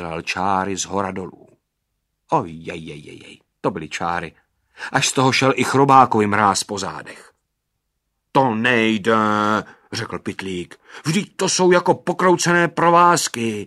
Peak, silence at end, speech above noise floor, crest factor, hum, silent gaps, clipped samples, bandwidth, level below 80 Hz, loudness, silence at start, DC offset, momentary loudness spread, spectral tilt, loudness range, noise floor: 0 dBFS; 0 s; 56 dB; 20 dB; none; none; under 0.1%; 13.5 kHz; -58 dBFS; -18 LUFS; 0 s; under 0.1%; 18 LU; -4 dB/octave; 10 LU; -75 dBFS